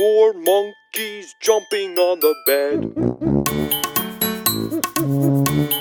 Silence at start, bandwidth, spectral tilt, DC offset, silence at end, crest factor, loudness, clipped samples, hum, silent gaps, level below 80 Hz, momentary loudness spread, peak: 0 s; 20 kHz; -4.5 dB/octave; under 0.1%; 0 s; 16 dB; -19 LUFS; under 0.1%; none; none; -46 dBFS; 7 LU; -2 dBFS